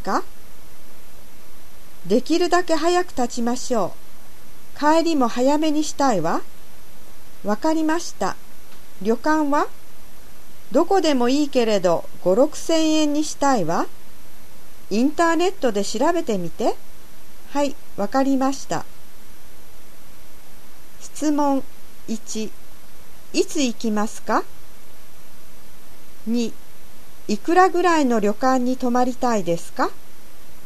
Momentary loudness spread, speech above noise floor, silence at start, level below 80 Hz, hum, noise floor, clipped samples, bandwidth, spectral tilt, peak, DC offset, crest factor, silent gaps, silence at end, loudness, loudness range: 11 LU; 24 dB; 0.05 s; -50 dBFS; none; -45 dBFS; under 0.1%; 14 kHz; -4.5 dB/octave; -4 dBFS; 7%; 20 dB; none; 0 s; -21 LUFS; 8 LU